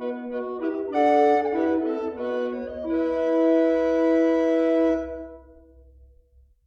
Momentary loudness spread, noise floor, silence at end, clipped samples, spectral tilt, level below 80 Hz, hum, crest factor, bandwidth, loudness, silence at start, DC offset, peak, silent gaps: 11 LU; -57 dBFS; 1.25 s; under 0.1%; -6.5 dB/octave; -54 dBFS; none; 14 dB; 7 kHz; -23 LUFS; 0 s; under 0.1%; -8 dBFS; none